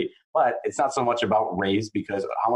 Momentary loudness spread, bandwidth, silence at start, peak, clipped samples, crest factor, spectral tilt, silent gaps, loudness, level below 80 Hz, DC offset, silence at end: 6 LU; 11 kHz; 0 s; -10 dBFS; under 0.1%; 14 dB; -5 dB/octave; 0.24-0.33 s; -25 LUFS; -64 dBFS; under 0.1%; 0 s